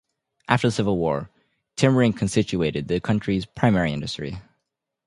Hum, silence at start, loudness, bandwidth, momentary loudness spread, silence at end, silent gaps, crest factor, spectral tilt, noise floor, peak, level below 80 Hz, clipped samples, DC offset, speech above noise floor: none; 0.5 s; -23 LUFS; 11.5 kHz; 14 LU; 0.65 s; none; 22 dB; -6 dB/octave; -80 dBFS; 0 dBFS; -48 dBFS; under 0.1%; under 0.1%; 58 dB